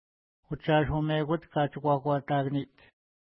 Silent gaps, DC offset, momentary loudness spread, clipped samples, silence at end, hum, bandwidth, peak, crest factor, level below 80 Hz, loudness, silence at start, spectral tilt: none; under 0.1%; 9 LU; under 0.1%; 0.6 s; none; 5 kHz; -12 dBFS; 18 dB; -52 dBFS; -29 LUFS; 0.5 s; -11 dB/octave